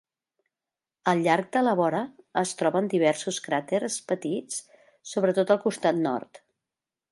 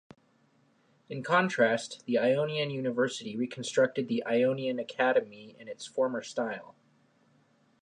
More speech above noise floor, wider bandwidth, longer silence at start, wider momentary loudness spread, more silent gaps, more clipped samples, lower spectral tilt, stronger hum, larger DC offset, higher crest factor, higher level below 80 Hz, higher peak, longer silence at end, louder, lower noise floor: first, over 65 dB vs 38 dB; about the same, 11.5 kHz vs 10.5 kHz; about the same, 1.05 s vs 1.1 s; second, 9 LU vs 14 LU; neither; neither; about the same, -4.5 dB/octave vs -5 dB/octave; neither; neither; about the same, 20 dB vs 20 dB; about the same, -78 dBFS vs -82 dBFS; first, -6 dBFS vs -12 dBFS; second, 0.75 s vs 1.15 s; first, -26 LUFS vs -29 LUFS; first, under -90 dBFS vs -67 dBFS